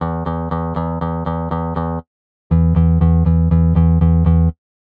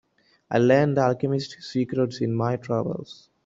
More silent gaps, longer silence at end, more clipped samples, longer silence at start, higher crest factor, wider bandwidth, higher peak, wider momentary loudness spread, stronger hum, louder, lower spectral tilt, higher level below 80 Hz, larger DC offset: first, 2.07-2.50 s vs none; first, 0.45 s vs 0.3 s; neither; second, 0 s vs 0.5 s; second, 12 dB vs 18 dB; second, 3.7 kHz vs 7.8 kHz; about the same, -4 dBFS vs -6 dBFS; second, 8 LU vs 11 LU; neither; first, -16 LUFS vs -24 LUFS; first, -13 dB/octave vs -7.5 dB/octave; first, -22 dBFS vs -62 dBFS; neither